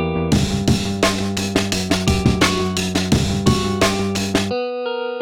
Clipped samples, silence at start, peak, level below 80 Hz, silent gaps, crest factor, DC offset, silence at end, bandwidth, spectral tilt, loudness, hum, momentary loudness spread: under 0.1%; 0 s; -2 dBFS; -32 dBFS; none; 16 dB; under 0.1%; 0 s; 19 kHz; -4.5 dB/octave; -18 LUFS; none; 5 LU